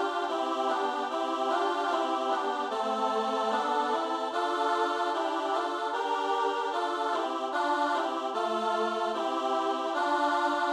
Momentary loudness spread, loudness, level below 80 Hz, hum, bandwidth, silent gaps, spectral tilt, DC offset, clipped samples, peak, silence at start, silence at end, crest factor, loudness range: 3 LU; -29 LUFS; -76 dBFS; none; 15.5 kHz; none; -2.5 dB/octave; under 0.1%; under 0.1%; -16 dBFS; 0 s; 0 s; 12 dB; 1 LU